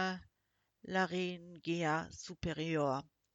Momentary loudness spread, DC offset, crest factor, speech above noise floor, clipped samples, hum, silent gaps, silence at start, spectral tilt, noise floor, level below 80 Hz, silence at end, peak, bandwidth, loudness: 11 LU; under 0.1%; 18 dB; 45 dB; under 0.1%; none; none; 0 s; -5.5 dB/octave; -82 dBFS; -64 dBFS; 0.35 s; -22 dBFS; 8 kHz; -38 LUFS